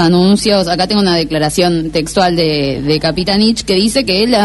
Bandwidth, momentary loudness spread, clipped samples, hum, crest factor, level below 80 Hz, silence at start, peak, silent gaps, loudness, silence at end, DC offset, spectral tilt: 12 kHz; 4 LU; under 0.1%; none; 12 dB; -34 dBFS; 0 s; 0 dBFS; none; -12 LUFS; 0 s; under 0.1%; -5 dB/octave